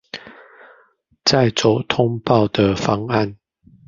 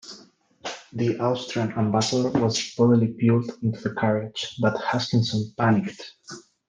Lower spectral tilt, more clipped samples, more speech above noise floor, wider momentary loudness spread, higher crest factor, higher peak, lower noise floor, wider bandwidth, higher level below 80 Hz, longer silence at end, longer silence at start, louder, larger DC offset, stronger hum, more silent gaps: about the same, -5.5 dB/octave vs -6 dB/octave; neither; first, 40 dB vs 29 dB; second, 9 LU vs 16 LU; about the same, 18 dB vs 16 dB; first, -2 dBFS vs -8 dBFS; first, -57 dBFS vs -53 dBFS; second, 7.4 kHz vs 9.8 kHz; first, -46 dBFS vs -62 dBFS; first, 0.55 s vs 0.3 s; about the same, 0.15 s vs 0.05 s; first, -18 LUFS vs -24 LUFS; neither; neither; neither